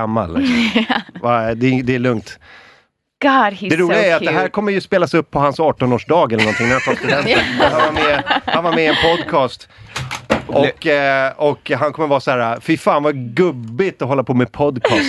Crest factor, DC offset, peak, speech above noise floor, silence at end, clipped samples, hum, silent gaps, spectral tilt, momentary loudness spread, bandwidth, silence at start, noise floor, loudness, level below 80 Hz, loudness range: 16 dB; under 0.1%; 0 dBFS; 39 dB; 0 s; under 0.1%; none; none; -5.5 dB/octave; 6 LU; 12.5 kHz; 0 s; -54 dBFS; -16 LUFS; -44 dBFS; 3 LU